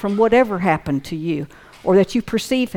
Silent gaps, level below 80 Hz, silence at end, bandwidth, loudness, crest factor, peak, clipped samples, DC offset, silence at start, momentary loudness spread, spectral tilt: none; -46 dBFS; 0 s; 17.5 kHz; -19 LUFS; 14 dB; -4 dBFS; under 0.1%; under 0.1%; 0 s; 11 LU; -6 dB/octave